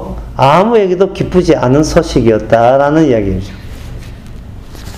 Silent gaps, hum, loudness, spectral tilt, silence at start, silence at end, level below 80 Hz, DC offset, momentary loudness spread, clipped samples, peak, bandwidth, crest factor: none; none; -10 LUFS; -6.5 dB/octave; 0 s; 0 s; -28 dBFS; under 0.1%; 22 LU; 0.5%; 0 dBFS; 15.5 kHz; 12 dB